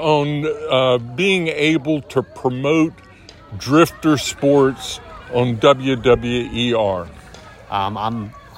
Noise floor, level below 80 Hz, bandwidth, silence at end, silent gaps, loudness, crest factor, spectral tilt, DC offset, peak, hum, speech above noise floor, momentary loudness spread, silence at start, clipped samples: -40 dBFS; -46 dBFS; 16 kHz; 0 s; none; -18 LUFS; 18 dB; -5.5 dB/octave; under 0.1%; 0 dBFS; none; 23 dB; 12 LU; 0 s; under 0.1%